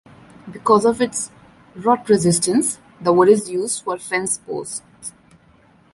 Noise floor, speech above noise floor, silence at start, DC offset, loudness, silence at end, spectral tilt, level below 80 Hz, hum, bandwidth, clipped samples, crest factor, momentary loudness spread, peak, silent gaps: -53 dBFS; 35 dB; 0.45 s; under 0.1%; -18 LUFS; 0.85 s; -4.5 dB/octave; -58 dBFS; none; 11.5 kHz; under 0.1%; 18 dB; 15 LU; -2 dBFS; none